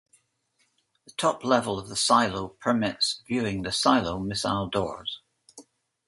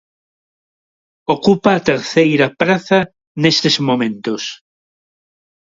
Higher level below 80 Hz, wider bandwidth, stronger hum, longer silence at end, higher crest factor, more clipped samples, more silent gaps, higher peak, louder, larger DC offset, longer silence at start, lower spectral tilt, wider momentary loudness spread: about the same, -54 dBFS vs -56 dBFS; first, 11.5 kHz vs 7.8 kHz; neither; second, 0.45 s vs 1.2 s; first, 22 dB vs 16 dB; neither; second, none vs 3.27-3.35 s; second, -6 dBFS vs 0 dBFS; second, -26 LUFS vs -15 LUFS; neither; about the same, 1.2 s vs 1.3 s; second, -3.5 dB/octave vs -5 dB/octave; about the same, 10 LU vs 10 LU